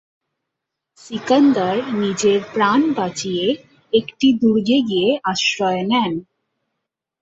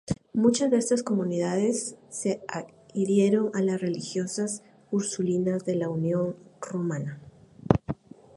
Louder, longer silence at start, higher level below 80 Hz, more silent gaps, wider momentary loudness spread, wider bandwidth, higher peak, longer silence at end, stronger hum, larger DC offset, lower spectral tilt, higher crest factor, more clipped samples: first, -18 LUFS vs -27 LUFS; first, 1.05 s vs 0.1 s; second, -60 dBFS vs -54 dBFS; neither; second, 7 LU vs 14 LU; second, 8 kHz vs 11.5 kHz; about the same, -2 dBFS vs -2 dBFS; first, 1 s vs 0.45 s; neither; neither; second, -4.5 dB/octave vs -6 dB/octave; second, 16 dB vs 24 dB; neither